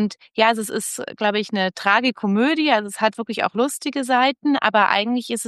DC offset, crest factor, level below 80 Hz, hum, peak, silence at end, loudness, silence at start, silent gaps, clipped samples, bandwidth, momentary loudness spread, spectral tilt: under 0.1%; 18 dB; -72 dBFS; none; -2 dBFS; 0 s; -20 LUFS; 0 s; none; under 0.1%; 12.5 kHz; 7 LU; -3.5 dB/octave